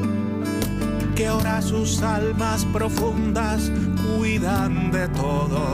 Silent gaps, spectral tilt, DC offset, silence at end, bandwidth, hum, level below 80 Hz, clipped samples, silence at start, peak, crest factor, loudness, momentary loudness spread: none; -6 dB/octave; under 0.1%; 0 s; 16 kHz; none; -32 dBFS; under 0.1%; 0 s; -10 dBFS; 12 dB; -23 LUFS; 3 LU